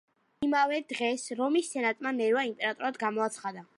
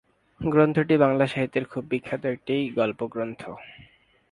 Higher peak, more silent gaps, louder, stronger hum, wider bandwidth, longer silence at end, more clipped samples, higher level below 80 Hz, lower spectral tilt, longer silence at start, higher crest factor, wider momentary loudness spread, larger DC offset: second, -14 dBFS vs -4 dBFS; neither; second, -30 LUFS vs -25 LUFS; neither; about the same, 11.5 kHz vs 11 kHz; second, 0.15 s vs 0.6 s; neither; second, -74 dBFS vs -58 dBFS; second, -3 dB/octave vs -8 dB/octave; about the same, 0.4 s vs 0.4 s; second, 16 dB vs 22 dB; second, 5 LU vs 13 LU; neither